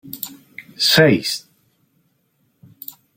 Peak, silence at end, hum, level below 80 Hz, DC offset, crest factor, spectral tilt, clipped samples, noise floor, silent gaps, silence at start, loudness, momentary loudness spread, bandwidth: 0 dBFS; 1.75 s; none; -58 dBFS; under 0.1%; 22 dB; -4 dB/octave; under 0.1%; -65 dBFS; none; 0.05 s; -15 LUFS; 25 LU; 16.5 kHz